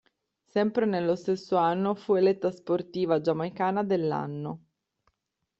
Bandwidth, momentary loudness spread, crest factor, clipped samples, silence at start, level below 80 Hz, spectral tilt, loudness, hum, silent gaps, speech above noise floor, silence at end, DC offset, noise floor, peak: 7.8 kHz; 8 LU; 16 dB; under 0.1%; 0.55 s; -72 dBFS; -8 dB/octave; -27 LUFS; none; none; 53 dB; 1 s; under 0.1%; -80 dBFS; -12 dBFS